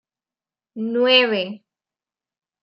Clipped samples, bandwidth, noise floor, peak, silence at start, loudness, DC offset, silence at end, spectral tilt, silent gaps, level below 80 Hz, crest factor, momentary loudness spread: under 0.1%; 6.2 kHz; under -90 dBFS; -2 dBFS; 0.75 s; -17 LUFS; under 0.1%; 1.05 s; -5.5 dB/octave; none; -82 dBFS; 20 dB; 15 LU